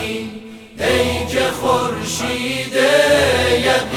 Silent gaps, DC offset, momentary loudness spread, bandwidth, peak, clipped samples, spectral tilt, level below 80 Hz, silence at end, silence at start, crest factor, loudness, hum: none; under 0.1%; 13 LU; 19 kHz; -2 dBFS; under 0.1%; -3.5 dB/octave; -40 dBFS; 0 s; 0 s; 14 dB; -16 LUFS; none